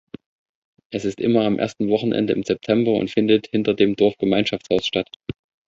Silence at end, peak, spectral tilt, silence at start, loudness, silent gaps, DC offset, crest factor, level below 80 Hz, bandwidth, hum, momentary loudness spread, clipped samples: 0.35 s; -4 dBFS; -6.5 dB/octave; 0.9 s; -20 LUFS; 5.16-5.20 s; under 0.1%; 18 dB; -54 dBFS; 7.8 kHz; none; 9 LU; under 0.1%